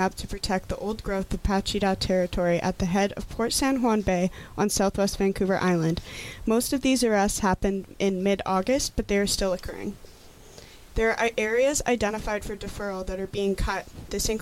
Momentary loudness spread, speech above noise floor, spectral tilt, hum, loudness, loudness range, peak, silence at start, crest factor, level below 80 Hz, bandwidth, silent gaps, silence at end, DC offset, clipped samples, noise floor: 9 LU; 22 dB; -4.5 dB/octave; none; -26 LUFS; 3 LU; -10 dBFS; 0 s; 16 dB; -40 dBFS; 16.5 kHz; none; 0 s; under 0.1%; under 0.1%; -48 dBFS